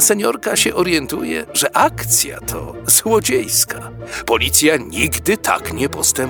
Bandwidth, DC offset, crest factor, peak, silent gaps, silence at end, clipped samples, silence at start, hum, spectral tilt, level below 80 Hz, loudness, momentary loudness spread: over 20 kHz; under 0.1%; 16 dB; 0 dBFS; none; 0 s; under 0.1%; 0 s; none; -2 dB/octave; -40 dBFS; -15 LUFS; 10 LU